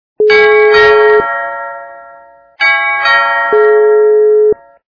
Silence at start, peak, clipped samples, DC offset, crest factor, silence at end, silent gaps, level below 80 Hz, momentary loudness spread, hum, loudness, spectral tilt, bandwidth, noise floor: 0.2 s; 0 dBFS; 0.3%; under 0.1%; 10 dB; 0.35 s; none; -48 dBFS; 12 LU; none; -8 LUFS; -3.5 dB/octave; 5.4 kHz; -39 dBFS